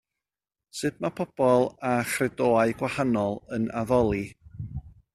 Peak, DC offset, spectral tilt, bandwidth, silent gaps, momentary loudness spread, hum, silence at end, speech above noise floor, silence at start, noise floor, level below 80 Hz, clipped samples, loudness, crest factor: -8 dBFS; under 0.1%; -6 dB/octave; 14 kHz; none; 16 LU; none; 0.25 s; over 65 dB; 0.75 s; under -90 dBFS; -52 dBFS; under 0.1%; -26 LUFS; 18 dB